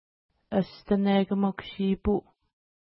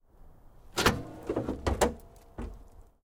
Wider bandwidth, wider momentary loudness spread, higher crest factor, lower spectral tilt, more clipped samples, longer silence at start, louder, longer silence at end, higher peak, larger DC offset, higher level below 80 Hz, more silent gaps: second, 5.8 kHz vs 18 kHz; second, 7 LU vs 18 LU; about the same, 18 dB vs 20 dB; first, -11.5 dB/octave vs -4 dB/octave; neither; first, 0.5 s vs 0.2 s; first, -28 LUFS vs -31 LUFS; first, 0.65 s vs 0.2 s; about the same, -12 dBFS vs -12 dBFS; neither; about the same, -48 dBFS vs -44 dBFS; neither